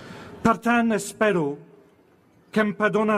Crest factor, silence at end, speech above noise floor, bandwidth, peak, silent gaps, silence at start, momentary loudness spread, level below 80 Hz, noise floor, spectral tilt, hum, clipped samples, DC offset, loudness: 16 dB; 0 s; 36 dB; 14.5 kHz; -8 dBFS; none; 0 s; 9 LU; -56 dBFS; -58 dBFS; -5.5 dB/octave; none; under 0.1%; under 0.1%; -23 LUFS